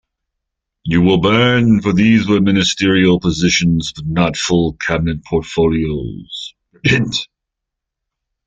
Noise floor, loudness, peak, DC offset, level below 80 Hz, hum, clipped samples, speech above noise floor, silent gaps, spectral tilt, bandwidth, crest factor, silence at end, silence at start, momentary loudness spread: -80 dBFS; -14 LUFS; 0 dBFS; under 0.1%; -38 dBFS; none; under 0.1%; 66 dB; none; -5.5 dB/octave; 9.2 kHz; 14 dB; 1.2 s; 0.85 s; 13 LU